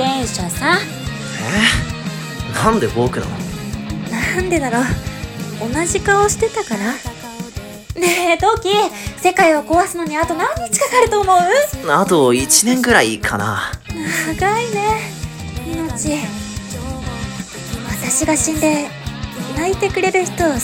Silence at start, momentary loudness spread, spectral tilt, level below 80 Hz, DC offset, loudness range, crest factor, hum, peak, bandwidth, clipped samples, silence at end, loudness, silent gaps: 0 s; 14 LU; -3.5 dB/octave; -34 dBFS; under 0.1%; 7 LU; 18 dB; none; 0 dBFS; 18 kHz; under 0.1%; 0 s; -17 LUFS; none